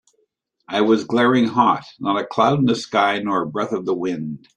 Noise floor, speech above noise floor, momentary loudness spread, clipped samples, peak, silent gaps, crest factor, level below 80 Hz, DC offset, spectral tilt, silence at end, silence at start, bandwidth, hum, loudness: -68 dBFS; 49 dB; 7 LU; under 0.1%; -2 dBFS; none; 18 dB; -62 dBFS; under 0.1%; -6 dB/octave; 0.2 s; 0.7 s; 10 kHz; none; -19 LUFS